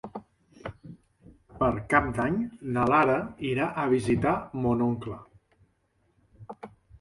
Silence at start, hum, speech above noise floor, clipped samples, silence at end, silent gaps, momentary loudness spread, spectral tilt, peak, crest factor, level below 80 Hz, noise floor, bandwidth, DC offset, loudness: 0.05 s; none; 44 dB; under 0.1%; 0.05 s; none; 22 LU; -7.5 dB/octave; -8 dBFS; 20 dB; -50 dBFS; -70 dBFS; 11.5 kHz; under 0.1%; -26 LUFS